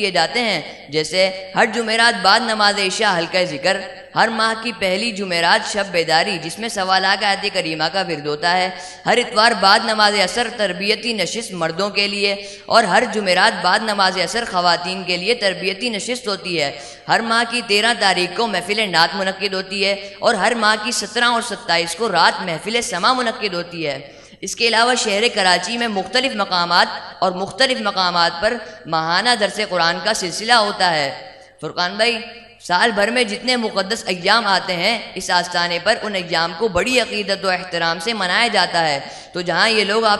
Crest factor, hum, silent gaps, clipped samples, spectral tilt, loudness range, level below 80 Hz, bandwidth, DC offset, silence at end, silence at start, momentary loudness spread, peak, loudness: 18 dB; none; none; under 0.1%; -2.5 dB/octave; 2 LU; -54 dBFS; 12 kHz; under 0.1%; 0 s; 0 s; 8 LU; 0 dBFS; -17 LUFS